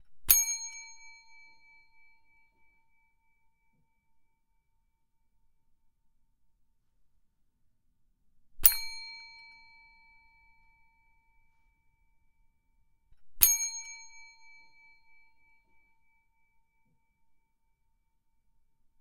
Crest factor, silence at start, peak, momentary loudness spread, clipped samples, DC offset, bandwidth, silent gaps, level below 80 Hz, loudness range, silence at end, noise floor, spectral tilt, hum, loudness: 38 dB; 0.1 s; 0 dBFS; 25 LU; under 0.1%; under 0.1%; 15.5 kHz; none; -58 dBFS; 13 LU; 4.5 s; -73 dBFS; 2 dB/octave; none; -25 LUFS